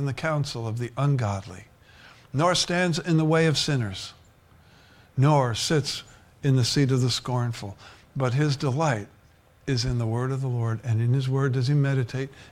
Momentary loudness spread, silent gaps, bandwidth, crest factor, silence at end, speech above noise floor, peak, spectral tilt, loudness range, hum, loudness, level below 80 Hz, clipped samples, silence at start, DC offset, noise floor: 13 LU; none; 14 kHz; 16 dB; 0.05 s; 32 dB; -8 dBFS; -5.5 dB/octave; 3 LU; none; -25 LUFS; -52 dBFS; under 0.1%; 0 s; under 0.1%; -57 dBFS